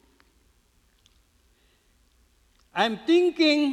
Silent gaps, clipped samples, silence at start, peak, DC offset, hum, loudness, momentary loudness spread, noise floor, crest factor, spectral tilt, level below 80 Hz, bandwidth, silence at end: none; under 0.1%; 2.75 s; -8 dBFS; under 0.1%; none; -23 LUFS; 7 LU; -64 dBFS; 20 dB; -4 dB/octave; -66 dBFS; 10.5 kHz; 0 s